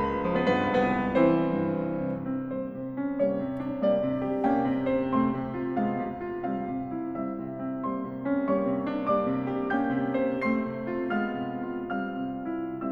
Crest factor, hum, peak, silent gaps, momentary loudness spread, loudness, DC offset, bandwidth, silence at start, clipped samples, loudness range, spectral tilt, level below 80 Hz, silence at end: 18 dB; none; -10 dBFS; none; 8 LU; -28 LUFS; under 0.1%; 5.2 kHz; 0 s; under 0.1%; 3 LU; -9 dB/octave; -54 dBFS; 0 s